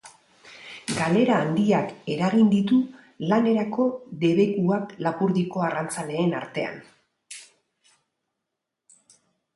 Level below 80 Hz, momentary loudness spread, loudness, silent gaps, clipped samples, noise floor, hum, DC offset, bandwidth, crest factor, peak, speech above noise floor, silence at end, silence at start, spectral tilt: -66 dBFS; 17 LU; -24 LUFS; none; under 0.1%; -83 dBFS; none; under 0.1%; 11.5 kHz; 16 dB; -8 dBFS; 61 dB; 2.1 s; 0.05 s; -6.5 dB/octave